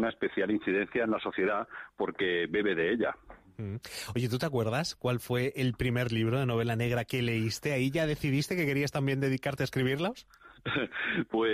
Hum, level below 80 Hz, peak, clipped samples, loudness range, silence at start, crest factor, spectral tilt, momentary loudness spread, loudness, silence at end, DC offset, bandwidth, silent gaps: none; -56 dBFS; -18 dBFS; under 0.1%; 2 LU; 0 s; 12 dB; -6 dB/octave; 7 LU; -31 LUFS; 0 s; under 0.1%; 15.5 kHz; none